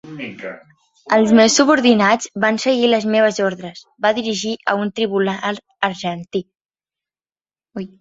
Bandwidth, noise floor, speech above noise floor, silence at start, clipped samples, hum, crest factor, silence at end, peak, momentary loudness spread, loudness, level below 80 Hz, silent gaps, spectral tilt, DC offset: 8 kHz; under -90 dBFS; over 73 dB; 0.05 s; under 0.1%; none; 16 dB; 0.15 s; -2 dBFS; 19 LU; -17 LUFS; -60 dBFS; none; -4 dB/octave; under 0.1%